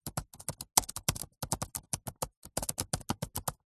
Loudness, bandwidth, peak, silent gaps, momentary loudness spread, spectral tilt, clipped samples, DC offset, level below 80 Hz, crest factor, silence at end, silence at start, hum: -35 LUFS; 13.5 kHz; -4 dBFS; 2.37-2.42 s; 12 LU; -2.5 dB/octave; under 0.1%; under 0.1%; -52 dBFS; 34 dB; 0.15 s; 0.05 s; none